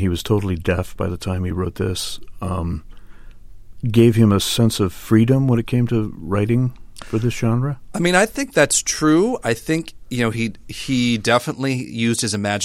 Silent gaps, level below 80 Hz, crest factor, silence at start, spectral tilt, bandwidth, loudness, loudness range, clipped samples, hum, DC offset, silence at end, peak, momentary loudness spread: none; -40 dBFS; 18 dB; 0 s; -5 dB/octave; 16 kHz; -19 LUFS; 6 LU; under 0.1%; none; under 0.1%; 0 s; -2 dBFS; 10 LU